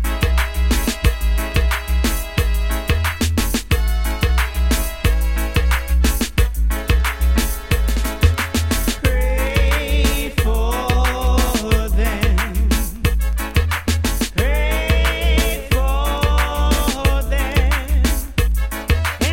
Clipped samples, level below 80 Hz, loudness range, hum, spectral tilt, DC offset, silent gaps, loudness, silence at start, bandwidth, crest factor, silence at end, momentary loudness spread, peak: under 0.1%; -18 dBFS; 1 LU; none; -4.5 dB/octave; under 0.1%; none; -19 LUFS; 0 s; 17 kHz; 16 dB; 0 s; 3 LU; 0 dBFS